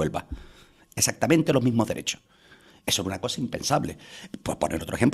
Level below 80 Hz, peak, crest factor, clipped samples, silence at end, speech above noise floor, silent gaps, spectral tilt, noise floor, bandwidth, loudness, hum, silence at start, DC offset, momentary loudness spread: -50 dBFS; -6 dBFS; 22 dB; under 0.1%; 0 s; 29 dB; none; -4 dB/octave; -54 dBFS; 14.5 kHz; -26 LUFS; none; 0 s; under 0.1%; 17 LU